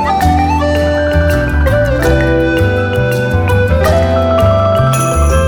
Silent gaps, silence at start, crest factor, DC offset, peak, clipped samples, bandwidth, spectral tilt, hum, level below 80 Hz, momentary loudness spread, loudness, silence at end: none; 0 s; 10 dB; under 0.1%; 0 dBFS; under 0.1%; 19 kHz; -6.5 dB/octave; none; -18 dBFS; 2 LU; -11 LUFS; 0 s